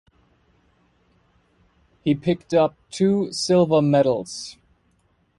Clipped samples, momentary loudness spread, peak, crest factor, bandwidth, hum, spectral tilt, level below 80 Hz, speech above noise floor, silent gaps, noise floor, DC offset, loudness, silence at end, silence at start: under 0.1%; 13 LU; -6 dBFS; 18 dB; 11.5 kHz; none; -6 dB/octave; -58 dBFS; 44 dB; none; -64 dBFS; under 0.1%; -21 LUFS; 0.85 s; 2.05 s